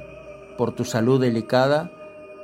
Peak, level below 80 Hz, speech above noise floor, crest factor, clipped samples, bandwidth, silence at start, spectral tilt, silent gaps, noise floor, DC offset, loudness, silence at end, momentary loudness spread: -4 dBFS; -58 dBFS; 20 dB; 20 dB; under 0.1%; 16.5 kHz; 0 s; -6.5 dB/octave; none; -41 dBFS; under 0.1%; -22 LUFS; 0 s; 21 LU